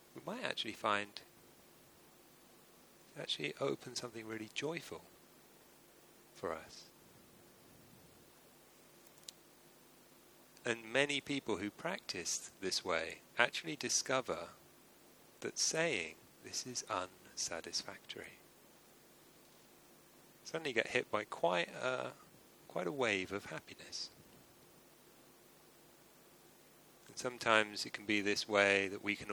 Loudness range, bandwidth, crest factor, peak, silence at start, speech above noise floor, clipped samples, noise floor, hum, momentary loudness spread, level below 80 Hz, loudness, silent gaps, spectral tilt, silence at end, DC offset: 15 LU; over 20 kHz; 30 dB; -12 dBFS; 0.15 s; 25 dB; under 0.1%; -64 dBFS; none; 19 LU; -78 dBFS; -38 LUFS; none; -2 dB/octave; 0 s; under 0.1%